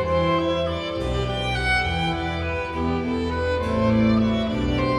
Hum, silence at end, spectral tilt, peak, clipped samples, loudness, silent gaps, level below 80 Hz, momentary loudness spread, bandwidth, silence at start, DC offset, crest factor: none; 0 s; -6.5 dB/octave; -8 dBFS; under 0.1%; -23 LUFS; none; -34 dBFS; 6 LU; 11 kHz; 0 s; under 0.1%; 14 dB